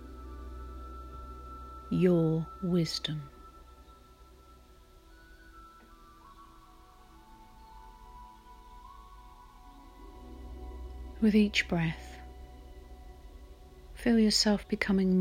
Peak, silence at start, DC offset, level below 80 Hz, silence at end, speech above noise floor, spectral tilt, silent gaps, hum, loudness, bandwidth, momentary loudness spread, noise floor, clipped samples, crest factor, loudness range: -14 dBFS; 0 s; under 0.1%; -50 dBFS; 0 s; 29 dB; -5.5 dB/octave; none; none; -29 LUFS; 16 kHz; 28 LU; -56 dBFS; under 0.1%; 20 dB; 23 LU